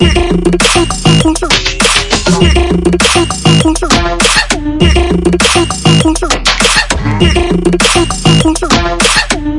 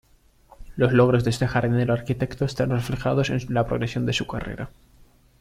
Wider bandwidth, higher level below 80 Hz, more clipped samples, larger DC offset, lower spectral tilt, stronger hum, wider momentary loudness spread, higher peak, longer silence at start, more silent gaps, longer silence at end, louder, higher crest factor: about the same, 12 kHz vs 13 kHz; first, -18 dBFS vs -44 dBFS; first, 0.7% vs under 0.1%; neither; second, -4 dB/octave vs -6.5 dB/octave; neither; second, 3 LU vs 13 LU; first, 0 dBFS vs -6 dBFS; second, 0 s vs 0.6 s; neither; second, 0 s vs 0.7 s; first, -8 LUFS vs -23 LUFS; second, 8 dB vs 18 dB